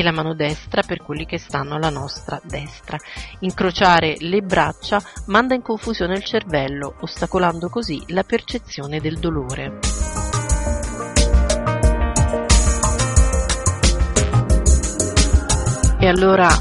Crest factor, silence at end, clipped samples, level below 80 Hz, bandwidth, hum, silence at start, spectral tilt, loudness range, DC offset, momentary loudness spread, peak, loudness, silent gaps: 18 dB; 0 s; under 0.1%; -22 dBFS; 11.5 kHz; none; 0 s; -4.5 dB/octave; 6 LU; under 0.1%; 12 LU; 0 dBFS; -19 LUFS; none